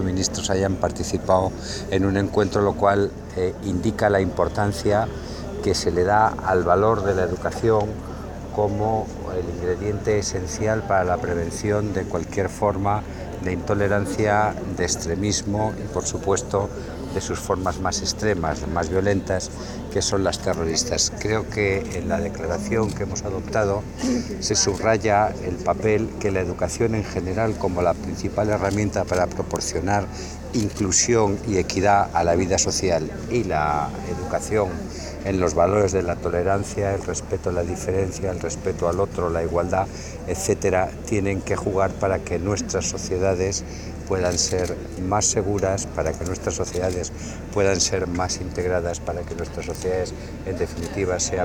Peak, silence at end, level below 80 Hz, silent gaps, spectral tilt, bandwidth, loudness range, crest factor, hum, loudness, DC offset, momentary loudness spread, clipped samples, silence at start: -4 dBFS; 0 s; -40 dBFS; none; -4.5 dB/octave; 18.5 kHz; 3 LU; 20 dB; none; -23 LUFS; under 0.1%; 8 LU; under 0.1%; 0 s